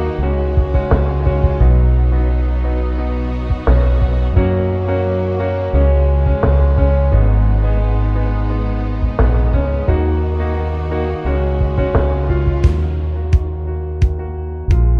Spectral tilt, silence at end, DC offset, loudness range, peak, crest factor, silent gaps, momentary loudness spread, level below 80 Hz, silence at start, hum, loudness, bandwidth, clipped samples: -10 dB/octave; 0 s; under 0.1%; 3 LU; 0 dBFS; 14 dB; none; 6 LU; -16 dBFS; 0 s; none; -17 LUFS; 4.7 kHz; under 0.1%